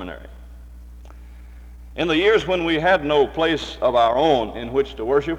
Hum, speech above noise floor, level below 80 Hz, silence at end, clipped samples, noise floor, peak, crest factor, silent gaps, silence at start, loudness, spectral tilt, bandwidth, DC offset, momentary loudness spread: none; 20 dB; -40 dBFS; 0 s; under 0.1%; -40 dBFS; -4 dBFS; 16 dB; none; 0 s; -19 LUFS; -5.5 dB/octave; 10.5 kHz; under 0.1%; 8 LU